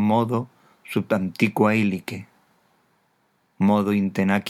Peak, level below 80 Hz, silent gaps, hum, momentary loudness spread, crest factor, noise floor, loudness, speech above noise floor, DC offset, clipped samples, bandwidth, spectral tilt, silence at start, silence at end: -6 dBFS; -70 dBFS; none; none; 12 LU; 18 dB; -67 dBFS; -22 LUFS; 45 dB; under 0.1%; under 0.1%; 14.5 kHz; -7 dB/octave; 0 s; 0 s